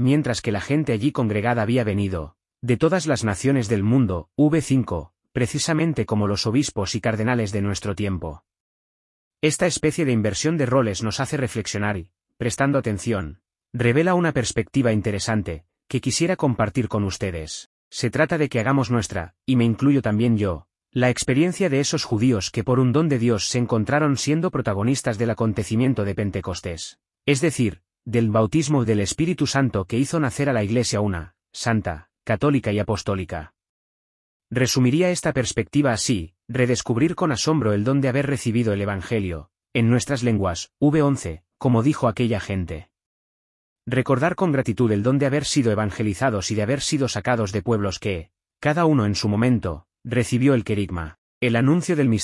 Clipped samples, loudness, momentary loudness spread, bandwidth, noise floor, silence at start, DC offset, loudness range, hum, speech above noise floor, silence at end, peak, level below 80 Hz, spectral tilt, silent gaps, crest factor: under 0.1%; -22 LUFS; 9 LU; 12 kHz; under -90 dBFS; 0 s; under 0.1%; 3 LU; none; over 69 dB; 0 s; -4 dBFS; -50 dBFS; -5.5 dB/octave; 8.60-9.31 s, 17.66-17.91 s, 33.69-34.40 s, 43.06-43.76 s, 51.18-51.41 s; 16 dB